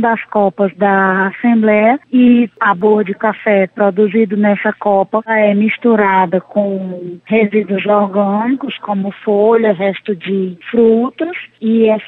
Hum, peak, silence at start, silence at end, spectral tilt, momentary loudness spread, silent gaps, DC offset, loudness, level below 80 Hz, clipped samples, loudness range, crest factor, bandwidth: none; -2 dBFS; 0 s; 0 s; -9.5 dB/octave; 8 LU; none; under 0.1%; -13 LUFS; -60 dBFS; under 0.1%; 3 LU; 12 dB; 4 kHz